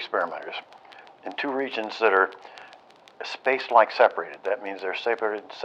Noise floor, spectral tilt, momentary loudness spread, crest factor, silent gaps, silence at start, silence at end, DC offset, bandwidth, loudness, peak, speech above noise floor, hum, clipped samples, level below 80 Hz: -52 dBFS; -3.5 dB/octave; 18 LU; 24 dB; none; 0 s; 0 s; under 0.1%; 8.4 kHz; -25 LUFS; -2 dBFS; 27 dB; none; under 0.1%; -88 dBFS